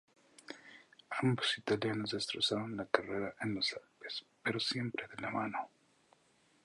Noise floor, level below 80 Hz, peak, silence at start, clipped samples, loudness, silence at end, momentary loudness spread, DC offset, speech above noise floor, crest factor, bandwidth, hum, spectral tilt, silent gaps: -71 dBFS; -74 dBFS; -10 dBFS; 0.5 s; under 0.1%; -36 LUFS; 0.95 s; 16 LU; under 0.1%; 35 dB; 28 dB; 11.5 kHz; none; -4.5 dB/octave; none